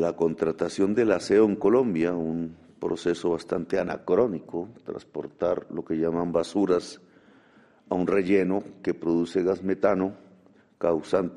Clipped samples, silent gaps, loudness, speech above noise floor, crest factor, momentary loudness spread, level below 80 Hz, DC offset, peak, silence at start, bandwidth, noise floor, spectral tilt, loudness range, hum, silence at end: under 0.1%; none; -26 LUFS; 32 dB; 18 dB; 12 LU; -60 dBFS; under 0.1%; -8 dBFS; 0 s; 11 kHz; -57 dBFS; -7 dB/octave; 4 LU; none; 0 s